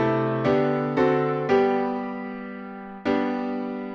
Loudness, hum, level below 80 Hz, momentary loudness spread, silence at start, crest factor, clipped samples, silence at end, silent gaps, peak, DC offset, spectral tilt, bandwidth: -24 LUFS; none; -58 dBFS; 13 LU; 0 s; 16 dB; under 0.1%; 0 s; none; -8 dBFS; under 0.1%; -8 dB/octave; 6.8 kHz